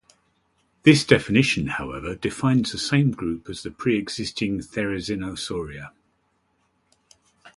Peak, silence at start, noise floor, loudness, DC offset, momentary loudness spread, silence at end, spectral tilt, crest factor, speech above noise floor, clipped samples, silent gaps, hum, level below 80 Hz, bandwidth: -2 dBFS; 0.85 s; -69 dBFS; -23 LUFS; under 0.1%; 14 LU; 0.05 s; -5.5 dB/octave; 24 dB; 46 dB; under 0.1%; none; none; -50 dBFS; 11.5 kHz